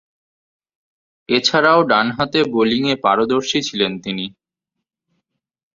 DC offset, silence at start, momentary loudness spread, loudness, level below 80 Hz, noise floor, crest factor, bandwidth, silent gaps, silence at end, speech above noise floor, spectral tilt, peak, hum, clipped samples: under 0.1%; 1.3 s; 11 LU; -17 LUFS; -58 dBFS; -81 dBFS; 18 dB; 7.6 kHz; none; 1.45 s; 64 dB; -4 dB/octave; 0 dBFS; none; under 0.1%